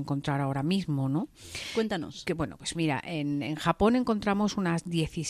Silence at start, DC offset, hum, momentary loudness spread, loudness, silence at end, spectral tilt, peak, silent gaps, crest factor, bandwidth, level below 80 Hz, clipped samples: 0 s; under 0.1%; none; 8 LU; -29 LUFS; 0 s; -6 dB/octave; -12 dBFS; none; 18 dB; 14 kHz; -52 dBFS; under 0.1%